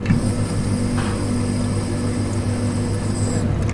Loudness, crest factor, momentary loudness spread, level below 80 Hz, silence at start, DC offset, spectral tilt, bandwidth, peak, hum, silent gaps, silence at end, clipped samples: -22 LUFS; 16 dB; 2 LU; -32 dBFS; 0 s; 0.2%; -6.5 dB/octave; 11.5 kHz; -4 dBFS; none; none; 0 s; under 0.1%